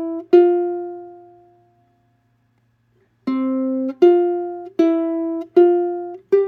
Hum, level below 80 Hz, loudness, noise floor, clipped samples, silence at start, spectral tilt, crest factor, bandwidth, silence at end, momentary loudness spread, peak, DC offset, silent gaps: none; -76 dBFS; -18 LUFS; -63 dBFS; under 0.1%; 0 s; -7.5 dB/octave; 18 dB; 4.6 kHz; 0 s; 14 LU; 0 dBFS; under 0.1%; none